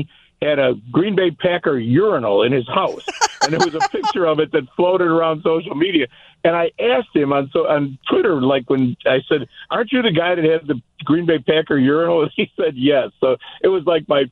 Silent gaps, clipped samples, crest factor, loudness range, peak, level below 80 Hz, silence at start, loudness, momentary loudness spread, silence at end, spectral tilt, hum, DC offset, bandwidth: none; under 0.1%; 16 dB; 1 LU; -2 dBFS; -56 dBFS; 0 s; -18 LUFS; 4 LU; 0.05 s; -5.5 dB/octave; none; under 0.1%; 8.6 kHz